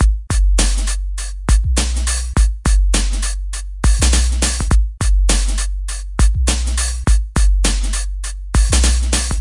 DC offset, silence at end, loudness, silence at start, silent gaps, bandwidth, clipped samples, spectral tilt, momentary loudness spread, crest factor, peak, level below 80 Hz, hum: under 0.1%; 0 s; -17 LUFS; 0 s; none; 11.5 kHz; under 0.1%; -3.5 dB/octave; 9 LU; 14 dB; 0 dBFS; -16 dBFS; none